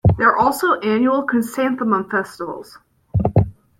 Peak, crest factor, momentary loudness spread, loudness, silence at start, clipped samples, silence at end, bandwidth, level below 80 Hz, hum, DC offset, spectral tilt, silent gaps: -2 dBFS; 16 dB; 13 LU; -18 LUFS; 0.05 s; under 0.1%; 0.25 s; 16.5 kHz; -38 dBFS; none; under 0.1%; -7 dB/octave; none